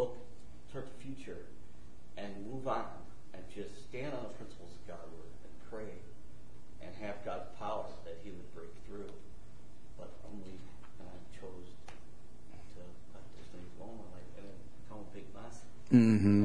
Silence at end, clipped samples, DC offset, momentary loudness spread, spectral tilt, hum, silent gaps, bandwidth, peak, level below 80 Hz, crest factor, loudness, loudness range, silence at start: 0 s; under 0.1%; 1%; 18 LU; -8 dB/octave; none; none; 10.5 kHz; -12 dBFS; -60 dBFS; 26 dB; -37 LUFS; 9 LU; 0 s